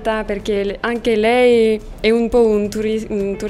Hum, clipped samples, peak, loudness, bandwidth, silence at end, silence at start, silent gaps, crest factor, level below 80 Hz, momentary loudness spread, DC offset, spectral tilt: none; under 0.1%; -2 dBFS; -16 LUFS; 13.5 kHz; 0 s; 0 s; none; 14 dB; -36 dBFS; 8 LU; under 0.1%; -5.5 dB/octave